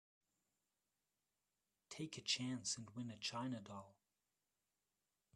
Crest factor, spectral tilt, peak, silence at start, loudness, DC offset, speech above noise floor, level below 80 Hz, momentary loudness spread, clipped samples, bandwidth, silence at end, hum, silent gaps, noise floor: 24 dB; -3 dB/octave; -26 dBFS; 1.9 s; -45 LUFS; under 0.1%; over 43 dB; -86 dBFS; 15 LU; under 0.1%; 13 kHz; 1.45 s; 50 Hz at -80 dBFS; none; under -90 dBFS